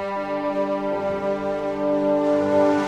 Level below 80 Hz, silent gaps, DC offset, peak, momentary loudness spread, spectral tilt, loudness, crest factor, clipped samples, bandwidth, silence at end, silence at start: -54 dBFS; none; under 0.1%; -8 dBFS; 6 LU; -7 dB/octave; -23 LUFS; 14 dB; under 0.1%; 9.2 kHz; 0 s; 0 s